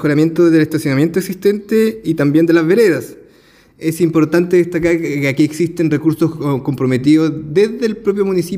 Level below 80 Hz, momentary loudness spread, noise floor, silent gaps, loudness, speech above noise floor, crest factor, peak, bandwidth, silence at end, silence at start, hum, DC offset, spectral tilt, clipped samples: -50 dBFS; 6 LU; -48 dBFS; none; -14 LUFS; 34 dB; 12 dB; -2 dBFS; 16 kHz; 0 s; 0 s; none; under 0.1%; -7 dB/octave; under 0.1%